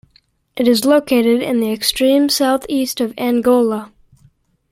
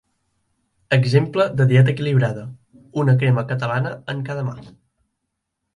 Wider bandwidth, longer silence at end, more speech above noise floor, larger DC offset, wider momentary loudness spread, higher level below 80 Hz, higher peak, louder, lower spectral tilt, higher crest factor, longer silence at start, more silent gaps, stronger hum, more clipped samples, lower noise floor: first, 16.5 kHz vs 10 kHz; second, 0.85 s vs 1.05 s; second, 42 dB vs 59 dB; neither; second, 7 LU vs 14 LU; about the same, -52 dBFS vs -56 dBFS; about the same, -2 dBFS vs -2 dBFS; first, -15 LUFS vs -19 LUFS; second, -3.5 dB/octave vs -8 dB/octave; about the same, 16 dB vs 18 dB; second, 0.55 s vs 0.9 s; neither; neither; neither; second, -57 dBFS vs -77 dBFS